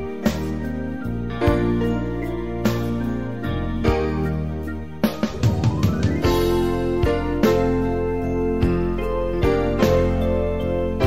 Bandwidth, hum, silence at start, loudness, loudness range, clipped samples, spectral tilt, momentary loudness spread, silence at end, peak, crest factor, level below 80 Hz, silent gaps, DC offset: 16 kHz; none; 0 s; -22 LUFS; 3 LU; under 0.1%; -7.5 dB/octave; 8 LU; 0 s; -4 dBFS; 16 dB; -30 dBFS; none; 1%